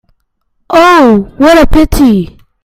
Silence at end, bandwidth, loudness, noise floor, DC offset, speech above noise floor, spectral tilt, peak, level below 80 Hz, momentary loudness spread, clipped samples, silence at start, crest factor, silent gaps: 0.4 s; 16.5 kHz; -6 LUFS; -60 dBFS; under 0.1%; 54 dB; -5.5 dB/octave; 0 dBFS; -20 dBFS; 7 LU; 3%; 0.7 s; 8 dB; none